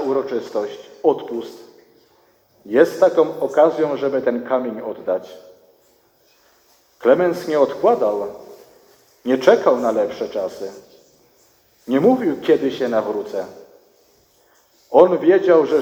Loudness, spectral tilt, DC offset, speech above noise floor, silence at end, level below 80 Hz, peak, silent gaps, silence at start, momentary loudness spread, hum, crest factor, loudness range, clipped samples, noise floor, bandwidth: -18 LUFS; -6 dB/octave; under 0.1%; 40 dB; 0 s; -66 dBFS; 0 dBFS; none; 0 s; 15 LU; none; 20 dB; 4 LU; under 0.1%; -57 dBFS; 16.5 kHz